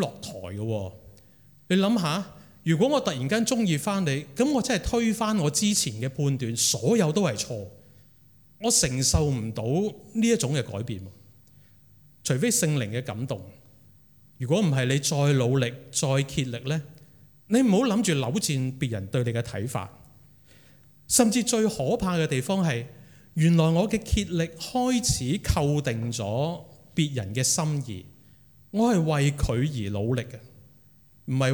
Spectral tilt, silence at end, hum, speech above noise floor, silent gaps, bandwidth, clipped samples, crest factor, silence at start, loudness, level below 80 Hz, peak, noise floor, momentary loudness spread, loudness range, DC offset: -4.5 dB/octave; 0 s; none; 32 dB; none; 18 kHz; under 0.1%; 20 dB; 0 s; -25 LUFS; -46 dBFS; -6 dBFS; -56 dBFS; 11 LU; 3 LU; under 0.1%